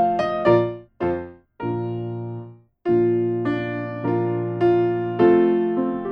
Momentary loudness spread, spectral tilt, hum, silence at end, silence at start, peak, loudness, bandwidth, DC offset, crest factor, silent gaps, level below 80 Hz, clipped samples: 13 LU; -9.5 dB/octave; none; 0 s; 0 s; -4 dBFS; -22 LUFS; 5.4 kHz; under 0.1%; 16 dB; none; -54 dBFS; under 0.1%